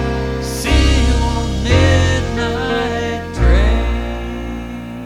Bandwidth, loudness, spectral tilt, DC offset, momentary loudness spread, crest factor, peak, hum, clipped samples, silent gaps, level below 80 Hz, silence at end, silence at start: 14 kHz; -16 LUFS; -5.5 dB/octave; under 0.1%; 12 LU; 14 dB; 0 dBFS; none; under 0.1%; none; -18 dBFS; 0 s; 0 s